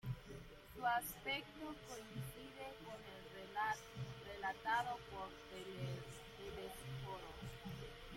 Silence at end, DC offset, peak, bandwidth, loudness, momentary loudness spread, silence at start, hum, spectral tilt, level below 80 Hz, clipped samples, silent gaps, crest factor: 0 s; under 0.1%; -28 dBFS; 16.5 kHz; -47 LUFS; 13 LU; 0.05 s; none; -4.5 dB/octave; -64 dBFS; under 0.1%; none; 20 dB